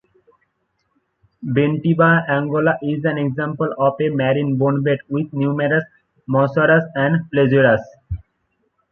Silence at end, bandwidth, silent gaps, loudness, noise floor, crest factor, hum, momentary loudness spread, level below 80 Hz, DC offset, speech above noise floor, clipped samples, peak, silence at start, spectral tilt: 0.75 s; 4.2 kHz; none; -18 LUFS; -69 dBFS; 16 dB; none; 8 LU; -46 dBFS; under 0.1%; 52 dB; under 0.1%; -2 dBFS; 1.4 s; -10 dB/octave